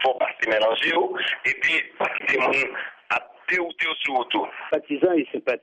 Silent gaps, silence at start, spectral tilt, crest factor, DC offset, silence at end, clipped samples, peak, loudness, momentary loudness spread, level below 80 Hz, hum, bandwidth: none; 0 s; -3.5 dB/octave; 16 dB; under 0.1%; 0.05 s; under 0.1%; -8 dBFS; -23 LUFS; 7 LU; -66 dBFS; none; 9.6 kHz